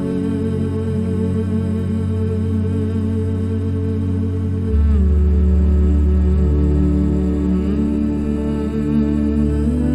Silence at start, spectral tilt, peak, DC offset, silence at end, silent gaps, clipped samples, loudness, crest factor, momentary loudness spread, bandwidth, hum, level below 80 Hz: 0 s; -10 dB/octave; -6 dBFS; under 0.1%; 0 s; none; under 0.1%; -18 LUFS; 10 dB; 5 LU; 8.2 kHz; none; -20 dBFS